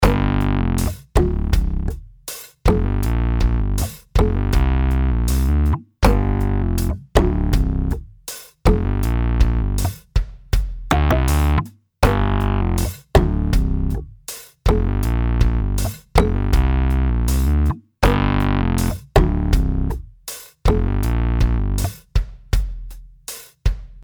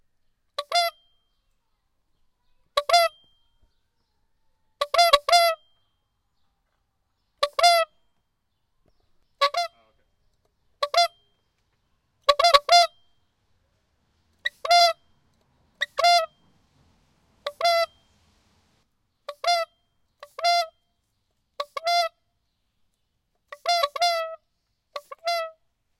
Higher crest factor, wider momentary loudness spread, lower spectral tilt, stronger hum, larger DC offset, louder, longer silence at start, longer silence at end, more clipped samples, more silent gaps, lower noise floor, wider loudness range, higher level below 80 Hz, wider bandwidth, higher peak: second, 18 dB vs 26 dB; second, 11 LU vs 18 LU; first, -6.5 dB/octave vs 2 dB/octave; neither; neither; about the same, -20 LUFS vs -22 LUFS; second, 0 s vs 0.6 s; second, 0 s vs 0.5 s; neither; neither; second, -37 dBFS vs -74 dBFS; second, 3 LU vs 6 LU; first, -20 dBFS vs -64 dBFS; first, over 20 kHz vs 16.5 kHz; about the same, 0 dBFS vs 0 dBFS